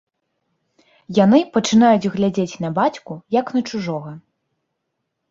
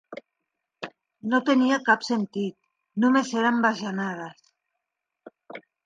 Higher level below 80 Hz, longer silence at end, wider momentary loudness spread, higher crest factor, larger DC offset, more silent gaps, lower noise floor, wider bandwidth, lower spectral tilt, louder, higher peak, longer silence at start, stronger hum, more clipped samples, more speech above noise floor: first, -60 dBFS vs -80 dBFS; first, 1.1 s vs 0.25 s; second, 13 LU vs 22 LU; about the same, 18 dB vs 20 dB; neither; neither; second, -76 dBFS vs -84 dBFS; second, 7.6 kHz vs 9.2 kHz; about the same, -6 dB/octave vs -5 dB/octave; first, -18 LUFS vs -24 LUFS; first, -2 dBFS vs -6 dBFS; first, 1.1 s vs 0.1 s; neither; neither; about the same, 59 dB vs 60 dB